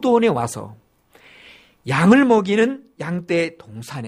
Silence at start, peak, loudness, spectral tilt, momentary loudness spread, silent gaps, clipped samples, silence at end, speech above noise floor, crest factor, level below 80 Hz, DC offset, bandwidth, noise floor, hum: 0 s; -2 dBFS; -18 LUFS; -6 dB/octave; 20 LU; none; under 0.1%; 0 s; 34 dB; 18 dB; -58 dBFS; under 0.1%; 15 kHz; -51 dBFS; none